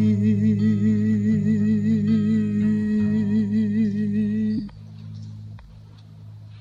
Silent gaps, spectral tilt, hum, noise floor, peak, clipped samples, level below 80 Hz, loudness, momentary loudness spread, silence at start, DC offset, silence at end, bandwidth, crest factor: none; -9.5 dB/octave; none; -44 dBFS; -10 dBFS; under 0.1%; -52 dBFS; -21 LUFS; 18 LU; 0 s; under 0.1%; 0 s; 7.4 kHz; 12 dB